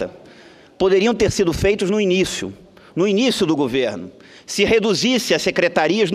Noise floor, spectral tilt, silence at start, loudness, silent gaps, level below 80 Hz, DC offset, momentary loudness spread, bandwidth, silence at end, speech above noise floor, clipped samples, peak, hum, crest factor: -45 dBFS; -4.5 dB/octave; 0 s; -18 LUFS; none; -42 dBFS; under 0.1%; 11 LU; 15.5 kHz; 0 s; 28 dB; under 0.1%; -2 dBFS; none; 16 dB